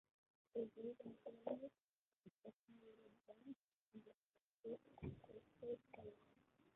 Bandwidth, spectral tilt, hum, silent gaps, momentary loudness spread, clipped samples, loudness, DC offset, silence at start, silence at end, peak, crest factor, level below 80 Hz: 3.9 kHz; -6.5 dB/octave; none; 1.84-2.12 s, 2.36-2.40 s, 2.53-2.68 s, 3.56-3.92 s, 4.14-4.34 s, 4.41-4.63 s; 16 LU; under 0.1%; -56 LUFS; under 0.1%; 0.55 s; 0.05 s; -34 dBFS; 24 dB; -78 dBFS